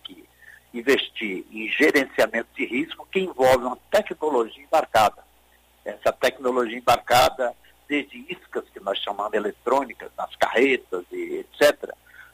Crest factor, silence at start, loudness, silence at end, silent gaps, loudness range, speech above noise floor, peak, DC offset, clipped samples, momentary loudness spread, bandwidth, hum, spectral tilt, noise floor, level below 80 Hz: 18 dB; 0.1 s; -23 LUFS; 0.15 s; none; 3 LU; 35 dB; -6 dBFS; under 0.1%; under 0.1%; 15 LU; 16 kHz; none; -3.5 dB/octave; -58 dBFS; -54 dBFS